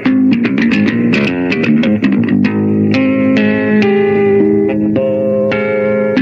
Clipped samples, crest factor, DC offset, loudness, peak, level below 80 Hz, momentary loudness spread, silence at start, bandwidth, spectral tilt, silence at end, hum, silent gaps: under 0.1%; 12 dB; under 0.1%; -12 LUFS; 0 dBFS; -48 dBFS; 3 LU; 0 s; 7 kHz; -8 dB/octave; 0 s; none; none